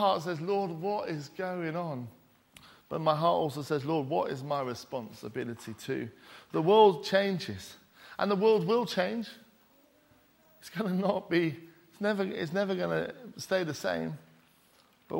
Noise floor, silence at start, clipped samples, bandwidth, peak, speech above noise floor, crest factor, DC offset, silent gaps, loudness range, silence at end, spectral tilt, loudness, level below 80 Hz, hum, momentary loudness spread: -64 dBFS; 0 s; under 0.1%; 16.5 kHz; -8 dBFS; 34 dB; 22 dB; under 0.1%; none; 6 LU; 0 s; -6 dB/octave; -31 LUFS; -72 dBFS; none; 16 LU